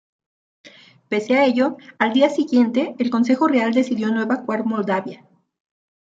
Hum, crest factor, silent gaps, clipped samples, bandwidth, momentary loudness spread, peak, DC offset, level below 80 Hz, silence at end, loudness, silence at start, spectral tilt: none; 18 dB; none; under 0.1%; 7.8 kHz; 6 LU; -2 dBFS; under 0.1%; -72 dBFS; 0.95 s; -19 LUFS; 1.1 s; -6 dB/octave